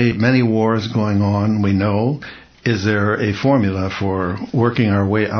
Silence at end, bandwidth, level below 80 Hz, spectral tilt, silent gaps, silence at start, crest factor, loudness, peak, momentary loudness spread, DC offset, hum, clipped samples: 0 s; 6.6 kHz; -38 dBFS; -7.5 dB/octave; none; 0 s; 16 dB; -17 LUFS; -2 dBFS; 6 LU; under 0.1%; none; under 0.1%